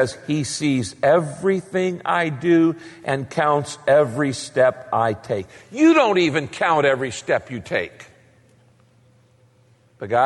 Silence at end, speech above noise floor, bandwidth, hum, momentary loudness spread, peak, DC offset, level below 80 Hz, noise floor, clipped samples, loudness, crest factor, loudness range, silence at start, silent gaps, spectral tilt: 0 s; 36 dB; 11.5 kHz; none; 9 LU; -4 dBFS; under 0.1%; -60 dBFS; -56 dBFS; under 0.1%; -20 LUFS; 16 dB; 5 LU; 0 s; none; -5.5 dB/octave